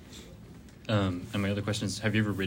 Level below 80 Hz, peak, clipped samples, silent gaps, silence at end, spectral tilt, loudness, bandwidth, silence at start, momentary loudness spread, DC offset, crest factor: -56 dBFS; -14 dBFS; under 0.1%; none; 0 s; -5.5 dB/octave; -30 LUFS; 16 kHz; 0 s; 20 LU; under 0.1%; 16 dB